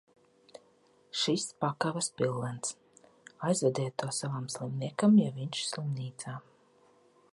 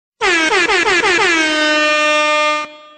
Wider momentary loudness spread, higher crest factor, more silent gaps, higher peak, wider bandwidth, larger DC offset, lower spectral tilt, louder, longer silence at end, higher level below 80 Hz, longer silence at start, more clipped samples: first, 13 LU vs 3 LU; first, 20 dB vs 12 dB; neither; second, -12 dBFS vs -2 dBFS; first, 11.5 kHz vs 9.4 kHz; neither; first, -5 dB/octave vs -1 dB/octave; second, -32 LUFS vs -12 LUFS; first, 0.9 s vs 0.2 s; second, -76 dBFS vs -48 dBFS; first, 0.55 s vs 0.2 s; neither